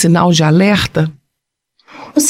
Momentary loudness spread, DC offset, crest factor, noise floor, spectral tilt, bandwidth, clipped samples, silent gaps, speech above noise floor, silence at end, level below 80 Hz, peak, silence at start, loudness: 9 LU; under 0.1%; 12 dB; -75 dBFS; -5 dB/octave; 16 kHz; under 0.1%; none; 64 dB; 0 s; -42 dBFS; 0 dBFS; 0 s; -12 LUFS